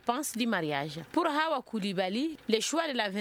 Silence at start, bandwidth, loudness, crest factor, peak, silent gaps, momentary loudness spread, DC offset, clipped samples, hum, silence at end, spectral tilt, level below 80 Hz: 0.05 s; 19 kHz; -31 LUFS; 20 dB; -10 dBFS; none; 5 LU; under 0.1%; under 0.1%; none; 0 s; -3.5 dB/octave; -72 dBFS